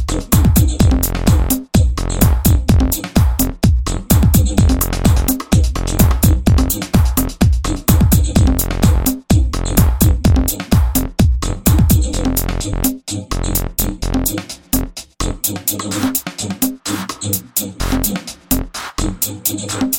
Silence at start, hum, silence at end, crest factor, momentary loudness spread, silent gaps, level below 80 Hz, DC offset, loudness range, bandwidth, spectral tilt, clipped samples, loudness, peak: 0 s; none; 0 s; 14 dB; 7 LU; none; -18 dBFS; under 0.1%; 5 LU; 17.5 kHz; -5 dB/octave; under 0.1%; -16 LUFS; 0 dBFS